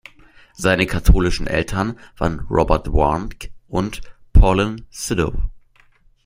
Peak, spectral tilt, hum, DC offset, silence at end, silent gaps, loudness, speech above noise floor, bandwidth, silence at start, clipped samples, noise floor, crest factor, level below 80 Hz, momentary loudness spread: -2 dBFS; -6 dB/octave; none; under 0.1%; 0.65 s; none; -20 LUFS; 35 dB; 16 kHz; 0.6 s; under 0.1%; -53 dBFS; 18 dB; -22 dBFS; 12 LU